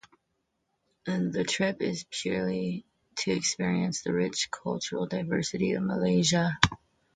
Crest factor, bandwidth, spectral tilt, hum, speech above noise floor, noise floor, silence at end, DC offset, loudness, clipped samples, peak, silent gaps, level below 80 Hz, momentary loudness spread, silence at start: 28 dB; 9.4 kHz; -4.5 dB/octave; none; 50 dB; -78 dBFS; 0.4 s; under 0.1%; -29 LUFS; under 0.1%; -2 dBFS; none; -56 dBFS; 9 LU; 1.05 s